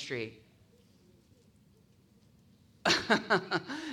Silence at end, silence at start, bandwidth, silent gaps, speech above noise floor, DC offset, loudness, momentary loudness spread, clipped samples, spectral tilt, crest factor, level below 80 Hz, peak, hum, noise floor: 0 s; 0 s; 16.5 kHz; none; 31 dB; under 0.1%; -31 LUFS; 12 LU; under 0.1%; -3.5 dB/octave; 22 dB; -70 dBFS; -14 dBFS; none; -64 dBFS